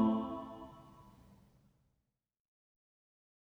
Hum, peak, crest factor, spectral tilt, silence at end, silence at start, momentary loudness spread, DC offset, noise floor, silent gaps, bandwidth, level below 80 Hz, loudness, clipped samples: none; -20 dBFS; 22 dB; -9 dB/octave; 2.4 s; 0 s; 25 LU; under 0.1%; -85 dBFS; none; 4.2 kHz; -70 dBFS; -39 LUFS; under 0.1%